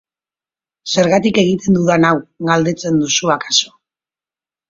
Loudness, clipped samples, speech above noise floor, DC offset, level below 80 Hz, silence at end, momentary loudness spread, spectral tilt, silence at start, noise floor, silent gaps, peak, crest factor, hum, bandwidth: -14 LUFS; under 0.1%; over 76 dB; under 0.1%; -52 dBFS; 1 s; 6 LU; -4 dB/octave; 0.85 s; under -90 dBFS; none; 0 dBFS; 16 dB; none; 7.6 kHz